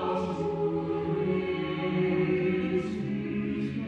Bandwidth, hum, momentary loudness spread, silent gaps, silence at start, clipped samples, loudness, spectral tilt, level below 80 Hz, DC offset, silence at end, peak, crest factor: 8.4 kHz; none; 5 LU; none; 0 s; under 0.1%; -29 LUFS; -8.5 dB/octave; -56 dBFS; under 0.1%; 0 s; -16 dBFS; 12 dB